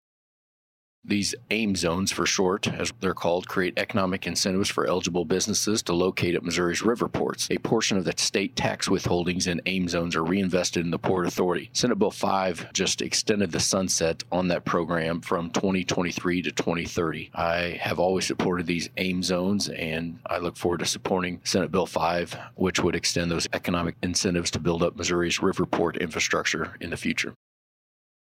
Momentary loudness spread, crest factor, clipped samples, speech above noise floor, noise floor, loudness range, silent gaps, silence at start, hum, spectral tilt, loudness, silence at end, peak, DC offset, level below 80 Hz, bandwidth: 4 LU; 20 dB; under 0.1%; over 64 dB; under -90 dBFS; 2 LU; none; 1.05 s; none; -4 dB/octave; -26 LUFS; 1.05 s; -6 dBFS; under 0.1%; -54 dBFS; 16 kHz